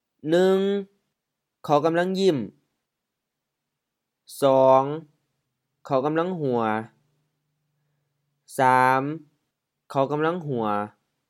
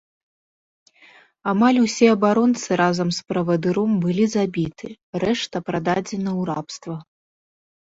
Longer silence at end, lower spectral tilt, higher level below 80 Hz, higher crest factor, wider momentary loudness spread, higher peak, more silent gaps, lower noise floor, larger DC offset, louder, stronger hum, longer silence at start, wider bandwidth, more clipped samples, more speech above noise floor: second, 0.4 s vs 0.9 s; about the same, -6.5 dB/octave vs -5.5 dB/octave; second, -80 dBFS vs -60 dBFS; about the same, 20 dB vs 18 dB; first, 17 LU vs 14 LU; about the same, -4 dBFS vs -2 dBFS; second, none vs 5.03-5.13 s; first, -83 dBFS vs -52 dBFS; neither; about the same, -23 LUFS vs -21 LUFS; neither; second, 0.25 s vs 1.45 s; first, 16 kHz vs 8 kHz; neither; first, 61 dB vs 32 dB